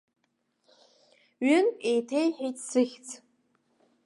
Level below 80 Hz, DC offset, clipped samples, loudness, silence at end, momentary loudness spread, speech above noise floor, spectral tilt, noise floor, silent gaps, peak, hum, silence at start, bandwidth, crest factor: -88 dBFS; under 0.1%; under 0.1%; -27 LUFS; 0.9 s; 19 LU; 49 dB; -3 dB/octave; -76 dBFS; none; -12 dBFS; none; 1.4 s; 11.5 kHz; 18 dB